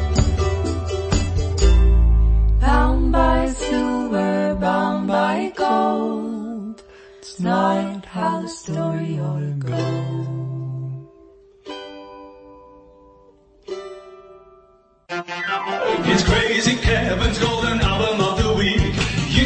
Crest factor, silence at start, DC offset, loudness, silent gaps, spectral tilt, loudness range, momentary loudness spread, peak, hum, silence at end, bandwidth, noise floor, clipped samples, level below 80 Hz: 18 dB; 0 s; under 0.1%; -20 LUFS; none; -5.5 dB/octave; 18 LU; 16 LU; -2 dBFS; none; 0 s; 8.8 kHz; -54 dBFS; under 0.1%; -24 dBFS